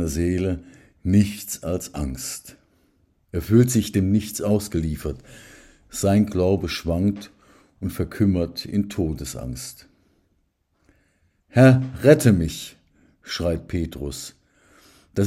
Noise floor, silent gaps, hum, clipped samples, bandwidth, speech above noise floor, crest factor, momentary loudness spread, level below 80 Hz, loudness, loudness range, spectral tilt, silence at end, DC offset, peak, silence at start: -68 dBFS; none; none; under 0.1%; 16 kHz; 47 dB; 22 dB; 17 LU; -44 dBFS; -22 LUFS; 7 LU; -6 dB/octave; 0 s; under 0.1%; 0 dBFS; 0 s